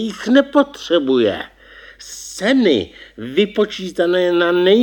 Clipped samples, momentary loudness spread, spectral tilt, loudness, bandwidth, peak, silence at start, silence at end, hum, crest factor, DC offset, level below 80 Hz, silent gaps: under 0.1%; 18 LU; -4.5 dB/octave; -16 LUFS; 17.5 kHz; 0 dBFS; 0 s; 0 s; none; 16 dB; under 0.1%; -54 dBFS; none